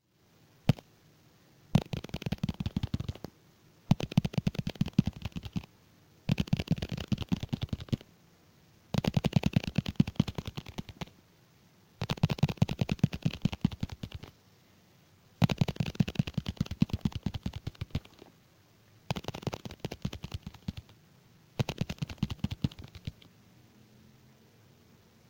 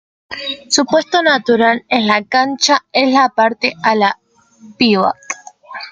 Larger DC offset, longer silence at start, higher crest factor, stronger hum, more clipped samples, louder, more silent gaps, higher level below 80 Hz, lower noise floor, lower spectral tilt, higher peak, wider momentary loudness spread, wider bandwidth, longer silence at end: neither; first, 0.65 s vs 0.3 s; first, 26 dB vs 14 dB; neither; neither; second, -34 LUFS vs -14 LUFS; neither; first, -50 dBFS vs -60 dBFS; first, -65 dBFS vs -33 dBFS; first, -7 dB/octave vs -3 dB/octave; second, -10 dBFS vs 0 dBFS; about the same, 14 LU vs 14 LU; first, 17 kHz vs 9.6 kHz; first, 2.2 s vs 0 s